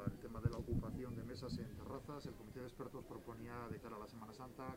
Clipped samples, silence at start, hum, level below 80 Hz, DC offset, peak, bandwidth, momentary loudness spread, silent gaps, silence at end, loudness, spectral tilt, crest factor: under 0.1%; 0 s; none; -58 dBFS; under 0.1%; -24 dBFS; 16 kHz; 9 LU; none; 0 s; -49 LUFS; -7.5 dB/octave; 24 dB